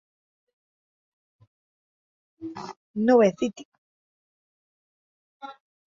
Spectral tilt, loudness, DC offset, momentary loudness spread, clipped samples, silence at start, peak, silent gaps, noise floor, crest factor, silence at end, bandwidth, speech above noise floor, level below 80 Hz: -6.5 dB/octave; -22 LUFS; under 0.1%; 25 LU; under 0.1%; 2.4 s; -6 dBFS; 2.77-2.94 s, 3.65-3.72 s, 3.78-5.40 s; under -90 dBFS; 22 dB; 0.4 s; 7.4 kHz; over 67 dB; -72 dBFS